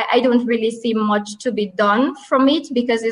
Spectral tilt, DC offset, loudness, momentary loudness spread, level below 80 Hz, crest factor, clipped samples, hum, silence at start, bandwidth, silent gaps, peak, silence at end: -5 dB/octave; under 0.1%; -18 LUFS; 6 LU; -62 dBFS; 14 dB; under 0.1%; none; 0 s; 11 kHz; none; -4 dBFS; 0 s